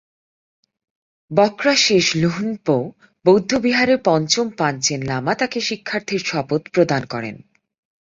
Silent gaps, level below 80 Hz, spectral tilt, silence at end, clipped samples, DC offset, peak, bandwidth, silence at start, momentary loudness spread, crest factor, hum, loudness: none; -56 dBFS; -4 dB/octave; 0.65 s; under 0.1%; under 0.1%; 0 dBFS; 7.8 kHz; 1.3 s; 8 LU; 20 dB; none; -18 LUFS